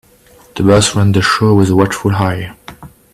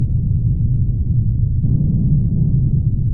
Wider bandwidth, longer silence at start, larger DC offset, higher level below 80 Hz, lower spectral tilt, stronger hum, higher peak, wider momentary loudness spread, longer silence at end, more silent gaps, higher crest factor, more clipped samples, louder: first, 14.5 kHz vs 0.9 kHz; first, 0.55 s vs 0 s; neither; second, -40 dBFS vs -22 dBFS; second, -5.5 dB/octave vs -19.5 dB/octave; neither; first, 0 dBFS vs -4 dBFS; first, 12 LU vs 2 LU; first, 0.25 s vs 0 s; neither; about the same, 12 dB vs 12 dB; neither; first, -12 LUFS vs -17 LUFS